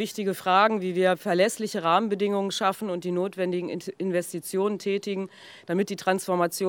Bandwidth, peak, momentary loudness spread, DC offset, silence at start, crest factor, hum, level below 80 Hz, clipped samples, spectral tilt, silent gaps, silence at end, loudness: over 20 kHz; -6 dBFS; 8 LU; under 0.1%; 0 s; 20 dB; none; -84 dBFS; under 0.1%; -4.5 dB/octave; none; 0 s; -26 LUFS